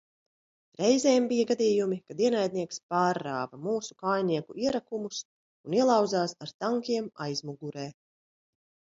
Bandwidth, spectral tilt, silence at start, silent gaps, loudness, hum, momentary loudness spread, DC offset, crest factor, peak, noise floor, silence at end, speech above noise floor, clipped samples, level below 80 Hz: 7.8 kHz; -5 dB/octave; 0.8 s; 2.83-2.89 s, 5.25-5.64 s, 6.54-6.59 s; -28 LUFS; none; 13 LU; under 0.1%; 20 dB; -10 dBFS; under -90 dBFS; 1.05 s; over 62 dB; under 0.1%; -72 dBFS